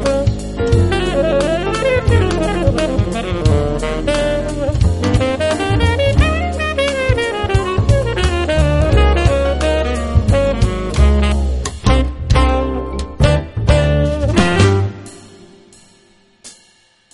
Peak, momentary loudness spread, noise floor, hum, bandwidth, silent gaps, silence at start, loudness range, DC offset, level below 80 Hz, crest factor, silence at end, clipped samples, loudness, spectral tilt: 0 dBFS; 5 LU; -52 dBFS; none; 11.5 kHz; none; 0 s; 2 LU; under 0.1%; -20 dBFS; 14 dB; 0.65 s; under 0.1%; -15 LUFS; -6 dB/octave